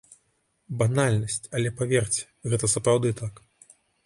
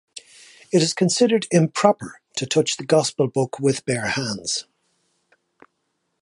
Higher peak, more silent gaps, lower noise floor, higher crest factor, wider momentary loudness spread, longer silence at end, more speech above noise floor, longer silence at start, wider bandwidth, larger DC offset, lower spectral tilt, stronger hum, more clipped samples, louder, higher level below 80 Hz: second, -8 dBFS vs -2 dBFS; neither; about the same, -71 dBFS vs -74 dBFS; about the same, 18 dB vs 22 dB; about the same, 8 LU vs 10 LU; second, 0.75 s vs 1.6 s; second, 46 dB vs 53 dB; first, 0.7 s vs 0.15 s; about the same, 11.5 kHz vs 11.5 kHz; neither; about the same, -5 dB/octave vs -4.5 dB/octave; neither; neither; second, -25 LUFS vs -21 LUFS; first, -54 dBFS vs -62 dBFS